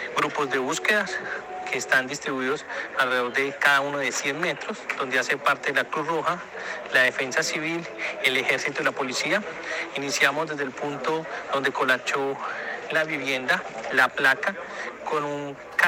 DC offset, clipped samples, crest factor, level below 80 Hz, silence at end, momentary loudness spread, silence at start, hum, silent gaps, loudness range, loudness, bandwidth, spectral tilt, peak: under 0.1%; under 0.1%; 20 dB; -68 dBFS; 0 s; 9 LU; 0 s; none; none; 2 LU; -25 LUFS; 18 kHz; -2.5 dB/octave; -4 dBFS